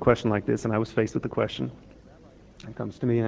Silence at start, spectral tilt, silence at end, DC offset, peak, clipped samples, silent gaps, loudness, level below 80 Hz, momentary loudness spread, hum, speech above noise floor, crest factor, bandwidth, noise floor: 0 s; -7 dB/octave; 0 s; under 0.1%; -6 dBFS; under 0.1%; none; -28 LUFS; -50 dBFS; 12 LU; none; 25 dB; 22 dB; 8 kHz; -51 dBFS